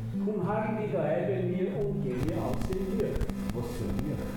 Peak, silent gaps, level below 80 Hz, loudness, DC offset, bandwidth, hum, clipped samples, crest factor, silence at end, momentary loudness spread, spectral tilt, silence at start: -16 dBFS; none; -42 dBFS; -31 LUFS; under 0.1%; 17.5 kHz; none; under 0.1%; 14 dB; 0 s; 4 LU; -8 dB/octave; 0 s